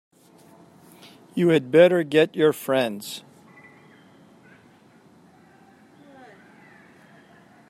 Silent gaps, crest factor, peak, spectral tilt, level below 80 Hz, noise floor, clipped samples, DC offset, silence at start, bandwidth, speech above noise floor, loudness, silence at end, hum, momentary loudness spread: none; 22 dB; -2 dBFS; -6 dB/octave; -74 dBFS; -54 dBFS; under 0.1%; under 0.1%; 1.35 s; 15.5 kHz; 34 dB; -20 LUFS; 4.5 s; none; 18 LU